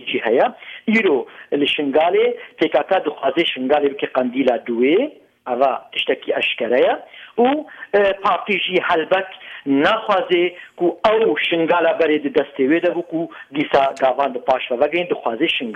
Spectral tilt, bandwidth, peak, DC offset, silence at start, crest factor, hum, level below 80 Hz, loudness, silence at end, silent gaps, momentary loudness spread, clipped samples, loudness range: -6 dB/octave; 9.4 kHz; -4 dBFS; under 0.1%; 0 s; 14 dB; none; -60 dBFS; -18 LUFS; 0 s; none; 7 LU; under 0.1%; 2 LU